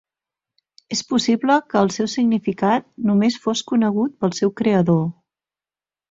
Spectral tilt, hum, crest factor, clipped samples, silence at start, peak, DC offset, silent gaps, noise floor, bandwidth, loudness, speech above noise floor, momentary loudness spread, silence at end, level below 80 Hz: -5.5 dB/octave; none; 18 dB; under 0.1%; 0.9 s; -2 dBFS; under 0.1%; none; under -90 dBFS; 7.8 kHz; -19 LUFS; over 71 dB; 4 LU; 1 s; -60 dBFS